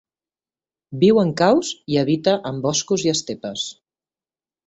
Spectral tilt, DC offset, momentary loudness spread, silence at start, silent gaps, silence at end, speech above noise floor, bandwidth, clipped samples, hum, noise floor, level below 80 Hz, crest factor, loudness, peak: -4.5 dB/octave; under 0.1%; 12 LU; 0.9 s; none; 0.95 s; over 71 dB; 8.2 kHz; under 0.1%; none; under -90 dBFS; -60 dBFS; 18 dB; -20 LUFS; -4 dBFS